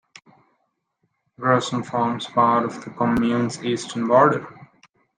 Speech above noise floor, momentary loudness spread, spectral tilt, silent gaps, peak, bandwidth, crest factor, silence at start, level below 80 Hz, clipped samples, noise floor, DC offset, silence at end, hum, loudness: 52 dB; 10 LU; -5.5 dB/octave; none; -4 dBFS; 9.8 kHz; 20 dB; 1.4 s; -56 dBFS; under 0.1%; -73 dBFS; under 0.1%; 0.55 s; none; -21 LUFS